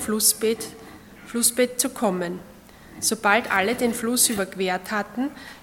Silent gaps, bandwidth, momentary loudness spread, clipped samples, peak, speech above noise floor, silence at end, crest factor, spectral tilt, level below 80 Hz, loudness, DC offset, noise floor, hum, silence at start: none; 17.5 kHz; 11 LU; under 0.1%; -4 dBFS; 20 dB; 0.05 s; 22 dB; -2 dB/octave; -58 dBFS; -22 LUFS; under 0.1%; -44 dBFS; none; 0 s